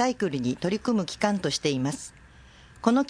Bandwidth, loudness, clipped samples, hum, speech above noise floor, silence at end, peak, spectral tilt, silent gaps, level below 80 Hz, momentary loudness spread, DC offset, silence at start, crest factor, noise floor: 10.5 kHz; -27 LUFS; under 0.1%; none; 26 dB; 0 s; -8 dBFS; -5 dB/octave; none; -56 dBFS; 6 LU; under 0.1%; 0 s; 20 dB; -51 dBFS